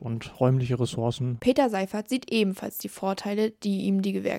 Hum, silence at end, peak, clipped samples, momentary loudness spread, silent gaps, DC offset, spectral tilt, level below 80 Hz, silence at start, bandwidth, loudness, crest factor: none; 0 s; -8 dBFS; under 0.1%; 7 LU; none; under 0.1%; -6.5 dB/octave; -60 dBFS; 0 s; 16.5 kHz; -27 LUFS; 18 dB